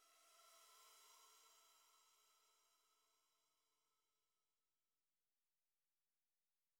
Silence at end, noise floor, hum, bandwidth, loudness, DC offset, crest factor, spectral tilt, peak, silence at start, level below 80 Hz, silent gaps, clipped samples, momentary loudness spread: 0 s; under -90 dBFS; none; 19.5 kHz; -68 LUFS; under 0.1%; 20 dB; 2.5 dB/octave; -58 dBFS; 0 s; under -90 dBFS; none; under 0.1%; 2 LU